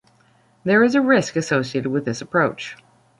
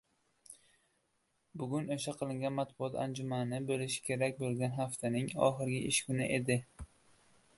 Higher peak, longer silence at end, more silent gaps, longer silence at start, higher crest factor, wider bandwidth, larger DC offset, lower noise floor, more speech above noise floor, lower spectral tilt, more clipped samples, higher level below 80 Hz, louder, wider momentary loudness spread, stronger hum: first, -4 dBFS vs -16 dBFS; second, 0.45 s vs 0.7 s; neither; first, 0.65 s vs 0.5 s; about the same, 18 dB vs 22 dB; about the same, 11.5 kHz vs 12 kHz; neither; second, -57 dBFS vs -78 dBFS; second, 38 dB vs 43 dB; about the same, -5.5 dB/octave vs -5 dB/octave; neither; about the same, -60 dBFS vs -64 dBFS; first, -19 LUFS vs -36 LUFS; second, 13 LU vs 21 LU; neither